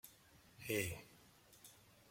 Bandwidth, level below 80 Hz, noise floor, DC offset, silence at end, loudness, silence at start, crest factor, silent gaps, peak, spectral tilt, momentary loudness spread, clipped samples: 16.5 kHz; -74 dBFS; -67 dBFS; under 0.1%; 0 s; -44 LUFS; 0.05 s; 24 dB; none; -26 dBFS; -4 dB/octave; 24 LU; under 0.1%